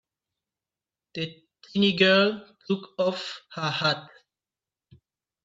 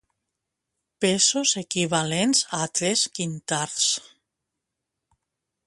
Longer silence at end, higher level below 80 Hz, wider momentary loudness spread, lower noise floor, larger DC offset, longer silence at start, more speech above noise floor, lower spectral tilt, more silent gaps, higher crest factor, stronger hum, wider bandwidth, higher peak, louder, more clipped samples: second, 1.4 s vs 1.65 s; second, -72 dBFS vs -66 dBFS; first, 16 LU vs 8 LU; first, under -90 dBFS vs -83 dBFS; neither; first, 1.15 s vs 1 s; first, over 65 dB vs 59 dB; first, -5.5 dB/octave vs -2.5 dB/octave; neither; about the same, 22 dB vs 20 dB; neither; second, 7.8 kHz vs 11.5 kHz; about the same, -6 dBFS vs -6 dBFS; second, -25 LUFS vs -22 LUFS; neither